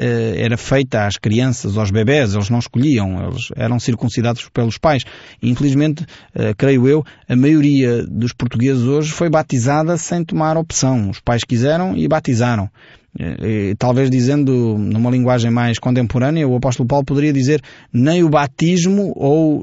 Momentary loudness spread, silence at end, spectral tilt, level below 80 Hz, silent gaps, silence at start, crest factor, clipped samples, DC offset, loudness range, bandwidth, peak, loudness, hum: 7 LU; 0 s; -6.5 dB/octave; -42 dBFS; none; 0 s; 12 dB; under 0.1%; under 0.1%; 2 LU; 8 kHz; -2 dBFS; -16 LUFS; none